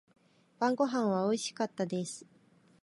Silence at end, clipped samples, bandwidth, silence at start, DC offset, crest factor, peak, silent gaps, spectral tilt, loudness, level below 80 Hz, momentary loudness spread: 0.65 s; under 0.1%; 11.5 kHz; 0.6 s; under 0.1%; 18 dB; -16 dBFS; none; -5 dB/octave; -32 LUFS; -82 dBFS; 9 LU